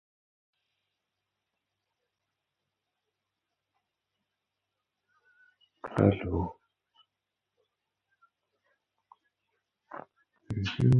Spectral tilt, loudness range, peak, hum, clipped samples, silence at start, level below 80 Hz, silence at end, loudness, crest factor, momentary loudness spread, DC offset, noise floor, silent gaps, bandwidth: -7.5 dB/octave; 22 LU; -8 dBFS; none; under 0.1%; 5.85 s; -54 dBFS; 0 s; -30 LUFS; 28 dB; 21 LU; under 0.1%; -87 dBFS; none; 6.8 kHz